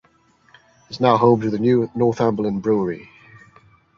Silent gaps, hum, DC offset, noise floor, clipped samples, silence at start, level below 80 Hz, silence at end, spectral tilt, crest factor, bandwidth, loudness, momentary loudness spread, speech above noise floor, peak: none; none; under 0.1%; -58 dBFS; under 0.1%; 0.9 s; -56 dBFS; 0.95 s; -8 dB/octave; 18 dB; 7 kHz; -19 LUFS; 10 LU; 39 dB; -2 dBFS